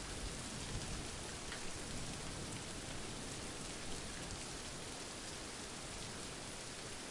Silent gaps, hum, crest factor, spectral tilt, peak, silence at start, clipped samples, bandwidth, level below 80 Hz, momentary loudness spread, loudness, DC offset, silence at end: none; none; 16 dB; -3 dB/octave; -30 dBFS; 0 s; under 0.1%; 11.5 kHz; -54 dBFS; 2 LU; -45 LUFS; under 0.1%; 0 s